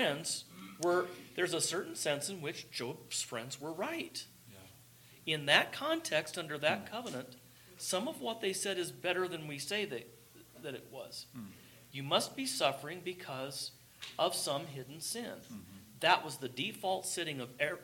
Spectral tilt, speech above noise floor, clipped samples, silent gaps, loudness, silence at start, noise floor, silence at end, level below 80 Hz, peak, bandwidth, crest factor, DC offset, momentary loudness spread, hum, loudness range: -2.5 dB/octave; 23 dB; under 0.1%; none; -36 LUFS; 0 s; -60 dBFS; 0 s; -78 dBFS; -12 dBFS; 17.5 kHz; 26 dB; under 0.1%; 16 LU; none; 5 LU